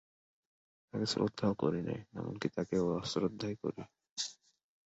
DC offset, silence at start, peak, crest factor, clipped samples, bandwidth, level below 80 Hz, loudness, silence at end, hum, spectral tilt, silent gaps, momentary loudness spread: under 0.1%; 0.95 s; -18 dBFS; 20 dB; under 0.1%; 8 kHz; -66 dBFS; -37 LUFS; 0.55 s; none; -5.5 dB/octave; 4.11-4.16 s; 9 LU